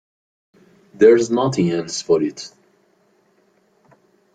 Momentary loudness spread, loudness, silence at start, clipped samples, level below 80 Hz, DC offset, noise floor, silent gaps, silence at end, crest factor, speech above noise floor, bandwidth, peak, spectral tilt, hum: 16 LU; -17 LUFS; 1 s; under 0.1%; -62 dBFS; under 0.1%; -60 dBFS; none; 1.9 s; 20 dB; 44 dB; 9.2 kHz; -2 dBFS; -5.5 dB/octave; none